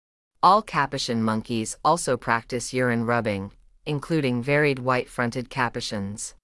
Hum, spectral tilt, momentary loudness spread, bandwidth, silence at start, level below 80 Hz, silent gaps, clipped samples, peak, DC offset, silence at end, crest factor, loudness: none; -5 dB/octave; 10 LU; 12 kHz; 0.45 s; -54 dBFS; none; under 0.1%; -6 dBFS; under 0.1%; 0.1 s; 20 dB; -24 LUFS